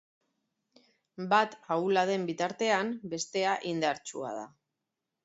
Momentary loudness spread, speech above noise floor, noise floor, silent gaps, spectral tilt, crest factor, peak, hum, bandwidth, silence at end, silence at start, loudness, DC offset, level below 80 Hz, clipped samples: 12 LU; 56 dB; -87 dBFS; none; -4 dB/octave; 20 dB; -12 dBFS; none; 8 kHz; 0.8 s; 1.2 s; -30 LUFS; under 0.1%; -78 dBFS; under 0.1%